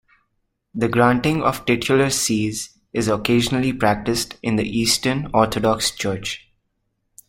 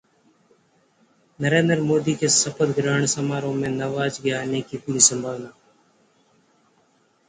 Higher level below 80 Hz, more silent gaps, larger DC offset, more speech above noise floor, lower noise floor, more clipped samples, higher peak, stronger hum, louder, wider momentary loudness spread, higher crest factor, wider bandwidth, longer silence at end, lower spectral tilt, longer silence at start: first, -46 dBFS vs -62 dBFS; neither; neither; first, 52 dB vs 41 dB; first, -72 dBFS vs -62 dBFS; neither; about the same, -2 dBFS vs 0 dBFS; neither; about the same, -20 LUFS vs -21 LUFS; second, 9 LU vs 12 LU; about the same, 20 dB vs 24 dB; first, 16.5 kHz vs 9.6 kHz; second, 0.9 s vs 1.8 s; about the same, -4 dB/octave vs -3.5 dB/octave; second, 0.75 s vs 1.4 s